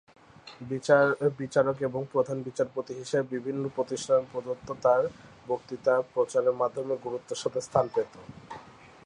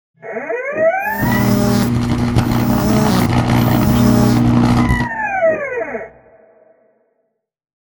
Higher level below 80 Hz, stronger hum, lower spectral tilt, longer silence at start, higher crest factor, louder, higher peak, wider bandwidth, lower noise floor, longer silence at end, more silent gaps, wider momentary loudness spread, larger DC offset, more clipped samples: second, -66 dBFS vs -30 dBFS; neither; about the same, -5.5 dB/octave vs -6.5 dB/octave; first, 0.45 s vs 0.25 s; about the same, 20 dB vs 16 dB; second, -28 LUFS vs -15 LUFS; second, -8 dBFS vs 0 dBFS; second, 11 kHz vs over 20 kHz; second, -50 dBFS vs -69 dBFS; second, 0.35 s vs 1.75 s; neither; about the same, 13 LU vs 11 LU; neither; neither